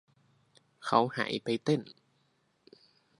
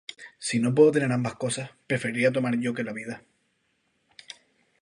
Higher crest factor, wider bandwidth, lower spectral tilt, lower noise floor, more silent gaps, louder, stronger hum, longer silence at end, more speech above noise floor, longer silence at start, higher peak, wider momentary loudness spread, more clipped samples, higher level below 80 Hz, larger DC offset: about the same, 26 dB vs 22 dB; about the same, 11.5 kHz vs 11.5 kHz; about the same, -6 dB/octave vs -5.5 dB/octave; about the same, -73 dBFS vs -72 dBFS; neither; second, -31 LUFS vs -25 LUFS; neither; second, 1.3 s vs 1.65 s; second, 43 dB vs 47 dB; first, 0.8 s vs 0.1 s; second, -10 dBFS vs -6 dBFS; second, 12 LU vs 24 LU; neither; second, -78 dBFS vs -70 dBFS; neither